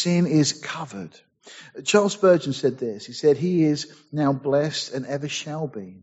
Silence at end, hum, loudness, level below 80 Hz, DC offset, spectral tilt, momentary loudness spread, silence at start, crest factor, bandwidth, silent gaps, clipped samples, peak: 0.1 s; none; -23 LUFS; -66 dBFS; under 0.1%; -5.5 dB/octave; 14 LU; 0 s; 20 dB; 8 kHz; none; under 0.1%; -4 dBFS